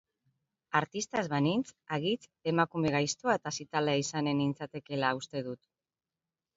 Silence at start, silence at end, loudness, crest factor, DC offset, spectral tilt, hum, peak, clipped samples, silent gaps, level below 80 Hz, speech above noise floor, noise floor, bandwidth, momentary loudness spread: 0.7 s; 1 s; -32 LUFS; 22 dB; under 0.1%; -4.5 dB/octave; none; -10 dBFS; under 0.1%; none; -68 dBFS; over 58 dB; under -90 dBFS; 8 kHz; 8 LU